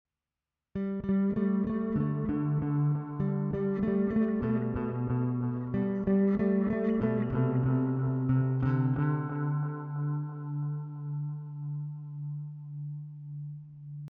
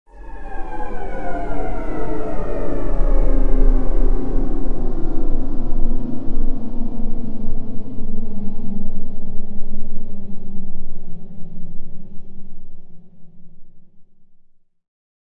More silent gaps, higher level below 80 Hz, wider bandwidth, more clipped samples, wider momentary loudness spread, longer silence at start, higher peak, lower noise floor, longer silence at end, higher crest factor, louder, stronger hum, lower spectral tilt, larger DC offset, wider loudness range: neither; second, -54 dBFS vs -20 dBFS; first, 3.7 kHz vs 2.4 kHz; neither; second, 12 LU vs 18 LU; first, 0.75 s vs 0.05 s; second, -16 dBFS vs 0 dBFS; first, under -90 dBFS vs -46 dBFS; second, 0 s vs 0.5 s; about the same, 14 dB vs 12 dB; second, -31 LUFS vs -27 LUFS; neither; about the same, -10.5 dB/octave vs -10 dB/octave; second, under 0.1% vs 10%; second, 8 LU vs 18 LU